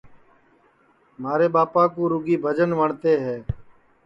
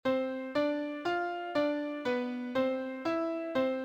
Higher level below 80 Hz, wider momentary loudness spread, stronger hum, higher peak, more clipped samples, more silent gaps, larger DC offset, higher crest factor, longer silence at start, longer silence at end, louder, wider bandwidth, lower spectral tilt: first, -48 dBFS vs -72 dBFS; first, 14 LU vs 3 LU; neither; first, -6 dBFS vs -18 dBFS; neither; neither; neither; about the same, 16 dB vs 14 dB; about the same, 0.05 s vs 0.05 s; first, 0.45 s vs 0 s; first, -21 LUFS vs -33 LUFS; second, 7 kHz vs 8.8 kHz; first, -9 dB/octave vs -5.5 dB/octave